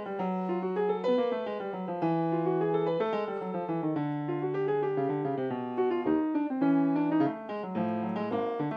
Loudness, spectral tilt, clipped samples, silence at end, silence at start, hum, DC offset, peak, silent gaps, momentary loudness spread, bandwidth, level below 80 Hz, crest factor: -30 LUFS; -9.5 dB/octave; under 0.1%; 0 s; 0 s; none; under 0.1%; -16 dBFS; none; 6 LU; 5.6 kHz; -74 dBFS; 14 dB